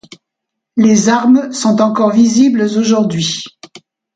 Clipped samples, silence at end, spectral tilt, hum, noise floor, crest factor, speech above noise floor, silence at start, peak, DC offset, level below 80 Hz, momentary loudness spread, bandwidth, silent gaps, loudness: under 0.1%; 0.7 s; -5 dB/octave; none; -78 dBFS; 12 dB; 67 dB; 0.75 s; 0 dBFS; under 0.1%; -58 dBFS; 8 LU; 9.2 kHz; none; -12 LUFS